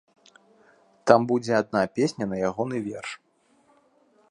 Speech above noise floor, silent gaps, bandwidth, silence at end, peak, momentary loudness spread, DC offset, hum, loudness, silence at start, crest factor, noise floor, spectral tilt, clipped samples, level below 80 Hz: 41 dB; none; 11 kHz; 1.15 s; 0 dBFS; 15 LU; under 0.1%; none; -25 LUFS; 1.05 s; 26 dB; -64 dBFS; -6 dB/octave; under 0.1%; -64 dBFS